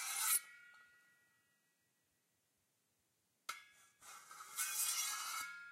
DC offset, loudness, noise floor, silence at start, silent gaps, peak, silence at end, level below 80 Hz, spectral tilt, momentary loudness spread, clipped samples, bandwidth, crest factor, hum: under 0.1%; -39 LUFS; -83 dBFS; 0 s; none; -22 dBFS; 0 s; under -90 dBFS; 4 dB/octave; 23 LU; under 0.1%; 16 kHz; 26 dB; none